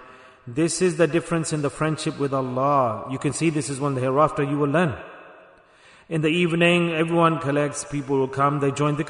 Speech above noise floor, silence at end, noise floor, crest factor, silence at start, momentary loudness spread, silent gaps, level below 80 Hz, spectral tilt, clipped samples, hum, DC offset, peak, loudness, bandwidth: 30 dB; 0 s; -52 dBFS; 16 dB; 0 s; 7 LU; none; -56 dBFS; -5.5 dB/octave; under 0.1%; none; under 0.1%; -6 dBFS; -22 LUFS; 11 kHz